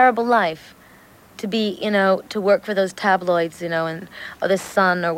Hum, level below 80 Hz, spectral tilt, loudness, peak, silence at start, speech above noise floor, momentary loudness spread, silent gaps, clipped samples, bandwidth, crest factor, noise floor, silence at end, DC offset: none; -62 dBFS; -5 dB/octave; -20 LUFS; -4 dBFS; 0 s; 29 dB; 9 LU; none; under 0.1%; 16.5 kHz; 16 dB; -48 dBFS; 0 s; under 0.1%